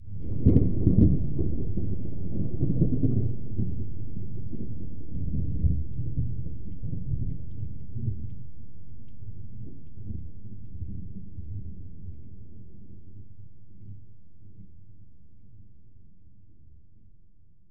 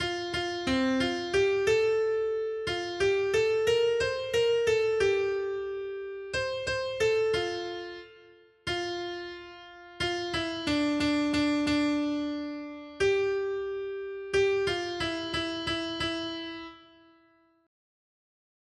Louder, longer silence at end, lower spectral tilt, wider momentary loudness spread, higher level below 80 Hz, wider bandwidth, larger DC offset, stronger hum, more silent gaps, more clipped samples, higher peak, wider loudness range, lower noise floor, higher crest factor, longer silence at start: about the same, -30 LUFS vs -29 LUFS; second, 0 s vs 1.85 s; first, -14.5 dB/octave vs -4.5 dB/octave; first, 26 LU vs 12 LU; first, -38 dBFS vs -56 dBFS; second, 2.3 kHz vs 12.5 kHz; first, 3% vs under 0.1%; neither; neither; neither; first, -6 dBFS vs -14 dBFS; first, 24 LU vs 7 LU; second, -59 dBFS vs -64 dBFS; first, 24 dB vs 16 dB; about the same, 0 s vs 0 s